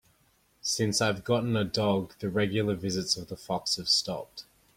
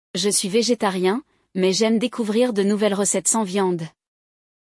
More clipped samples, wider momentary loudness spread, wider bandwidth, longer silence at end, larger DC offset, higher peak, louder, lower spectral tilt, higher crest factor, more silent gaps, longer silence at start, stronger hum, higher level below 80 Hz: neither; first, 10 LU vs 6 LU; first, 16.5 kHz vs 12 kHz; second, 0.35 s vs 0.85 s; neither; second, -12 dBFS vs -6 dBFS; second, -28 LUFS vs -20 LUFS; about the same, -4 dB/octave vs -3.5 dB/octave; about the same, 18 dB vs 16 dB; neither; first, 0.65 s vs 0.15 s; neither; first, -60 dBFS vs -70 dBFS